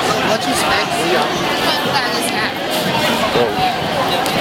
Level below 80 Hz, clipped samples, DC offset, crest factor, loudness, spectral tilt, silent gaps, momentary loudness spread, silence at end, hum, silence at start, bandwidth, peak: -46 dBFS; under 0.1%; under 0.1%; 16 dB; -16 LUFS; -3 dB/octave; none; 3 LU; 0 s; none; 0 s; 16.5 kHz; -2 dBFS